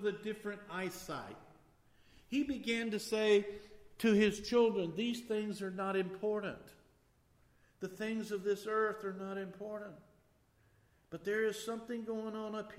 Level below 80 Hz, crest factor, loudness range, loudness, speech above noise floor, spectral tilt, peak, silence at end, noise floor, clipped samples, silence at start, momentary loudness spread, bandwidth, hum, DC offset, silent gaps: -70 dBFS; 20 dB; 7 LU; -37 LUFS; 34 dB; -5 dB/octave; -18 dBFS; 0 s; -71 dBFS; under 0.1%; 0 s; 15 LU; 16 kHz; none; under 0.1%; none